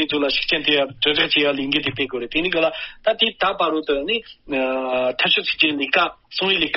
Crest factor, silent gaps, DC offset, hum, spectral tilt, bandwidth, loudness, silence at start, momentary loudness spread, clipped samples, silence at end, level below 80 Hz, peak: 18 dB; none; under 0.1%; none; -0.5 dB/octave; 6 kHz; -19 LUFS; 0 s; 7 LU; under 0.1%; 0 s; -50 dBFS; -2 dBFS